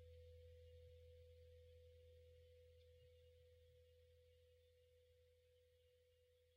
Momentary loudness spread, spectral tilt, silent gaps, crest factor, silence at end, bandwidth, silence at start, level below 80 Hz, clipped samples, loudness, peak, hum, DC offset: 4 LU; -5 dB/octave; none; 12 dB; 0 s; 6.4 kHz; 0 s; -74 dBFS; under 0.1%; -67 LUFS; -56 dBFS; none; under 0.1%